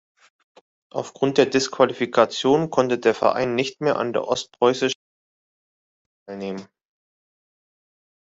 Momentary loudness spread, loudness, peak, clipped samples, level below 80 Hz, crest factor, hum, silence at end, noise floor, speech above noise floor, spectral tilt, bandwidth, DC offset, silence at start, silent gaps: 13 LU; -21 LUFS; -2 dBFS; under 0.1%; -66 dBFS; 22 dB; none; 1.65 s; under -90 dBFS; over 69 dB; -4.5 dB/octave; 8 kHz; under 0.1%; 0.95 s; 4.95-6.26 s